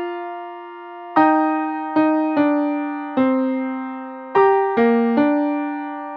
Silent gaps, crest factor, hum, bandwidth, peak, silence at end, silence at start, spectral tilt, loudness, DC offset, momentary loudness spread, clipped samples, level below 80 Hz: none; 16 dB; none; 5.2 kHz; -2 dBFS; 0 s; 0 s; -8.5 dB/octave; -19 LUFS; under 0.1%; 15 LU; under 0.1%; -74 dBFS